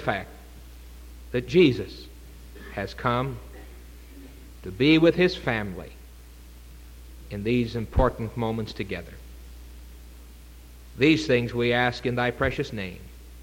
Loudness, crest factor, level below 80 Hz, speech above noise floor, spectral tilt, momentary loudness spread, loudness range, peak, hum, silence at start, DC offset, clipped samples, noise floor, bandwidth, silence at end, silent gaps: -25 LUFS; 20 dB; -40 dBFS; 21 dB; -6.5 dB/octave; 26 LU; 5 LU; -6 dBFS; none; 0 s; under 0.1%; under 0.1%; -46 dBFS; 17 kHz; 0 s; none